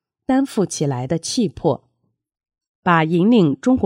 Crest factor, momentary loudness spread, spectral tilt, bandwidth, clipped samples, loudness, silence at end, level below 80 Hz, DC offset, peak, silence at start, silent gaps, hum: 16 dB; 8 LU; -6 dB/octave; 15 kHz; under 0.1%; -19 LUFS; 0 s; -52 dBFS; under 0.1%; -2 dBFS; 0.3 s; 2.67-2.83 s; none